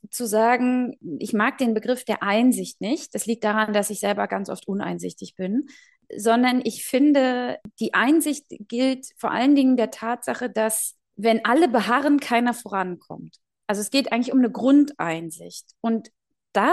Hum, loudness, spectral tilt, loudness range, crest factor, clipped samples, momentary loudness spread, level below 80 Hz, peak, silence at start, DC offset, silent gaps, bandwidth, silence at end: none; -22 LUFS; -4 dB/octave; 3 LU; 18 dB; under 0.1%; 12 LU; -72 dBFS; -4 dBFS; 0.15 s; under 0.1%; none; 12.5 kHz; 0 s